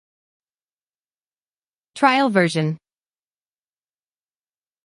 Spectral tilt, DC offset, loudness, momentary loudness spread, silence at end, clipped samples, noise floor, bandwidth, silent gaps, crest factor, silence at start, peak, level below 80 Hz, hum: -5.5 dB/octave; under 0.1%; -19 LUFS; 10 LU; 2.1 s; under 0.1%; under -90 dBFS; 11.5 kHz; none; 22 dB; 1.95 s; -2 dBFS; -74 dBFS; none